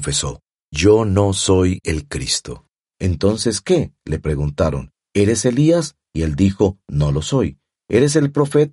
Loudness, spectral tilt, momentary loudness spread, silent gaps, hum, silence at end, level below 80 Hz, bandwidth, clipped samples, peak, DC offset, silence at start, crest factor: -18 LUFS; -5.5 dB/octave; 10 LU; 0.64-0.69 s; none; 0.05 s; -34 dBFS; 11.5 kHz; under 0.1%; 0 dBFS; under 0.1%; 0 s; 16 dB